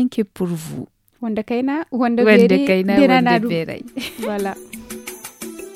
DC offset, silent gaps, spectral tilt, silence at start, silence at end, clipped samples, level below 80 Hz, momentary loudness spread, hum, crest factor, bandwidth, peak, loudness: under 0.1%; none; -6 dB/octave; 0 s; 0 s; under 0.1%; -54 dBFS; 20 LU; none; 18 dB; 16.5 kHz; 0 dBFS; -17 LUFS